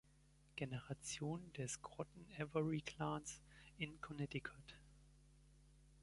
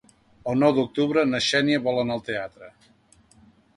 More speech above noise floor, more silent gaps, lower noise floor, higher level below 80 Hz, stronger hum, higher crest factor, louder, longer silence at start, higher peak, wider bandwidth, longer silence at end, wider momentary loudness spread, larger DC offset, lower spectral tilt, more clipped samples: second, 24 dB vs 35 dB; neither; first, -71 dBFS vs -58 dBFS; second, -70 dBFS vs -60 dBFS; neither; about the same, 22 dB vs 20 dB; second, -48 LUFS vs -23 LUFS; about the same, 0.45 s vs 0.45 s; second, -28 dBFS vs -6 dBFS; about the same, 11.5 kHz vs 11.5 kHz; second, 0 s vs 1.05 s; first, 14 LU vs 11 LU; neither; about the same, -5 dB/octave vs -5 dB/octave; neither